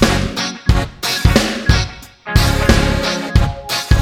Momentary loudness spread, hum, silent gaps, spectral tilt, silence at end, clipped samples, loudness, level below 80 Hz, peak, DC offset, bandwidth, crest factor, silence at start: 6 LU; none; none; -4.5 dB/octave; 0 s; under 0.1%; -16 LUFS; -20 dBFS; 0 dBFS; under 0.1%; 16.5 kHz; 14 dB; 0 s